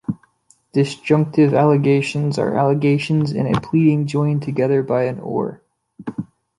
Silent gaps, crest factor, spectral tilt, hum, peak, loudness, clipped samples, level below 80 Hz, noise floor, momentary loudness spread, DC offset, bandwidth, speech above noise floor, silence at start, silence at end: none; 16 dB; -8 dB/octave; none; -2 dBFS; -18 LUFS; under 0.1%; -54 dBFS; -57 dBFS; 14 LU; under 0.1%; 11 kHz; 40 dB; 0.1 s; 0.35 s